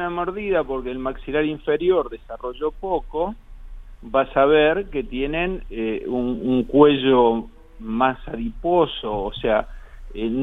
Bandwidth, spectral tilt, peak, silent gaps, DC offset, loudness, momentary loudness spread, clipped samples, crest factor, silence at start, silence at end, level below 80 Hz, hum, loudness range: 4 kHz; -8 dB/octave; 0 dBFS; none; under 0.1%; -21 LUFS; 14 LU; under 0.1%; 22 dB; 0 s; 0 s; -38 dBFS; none; 5 LU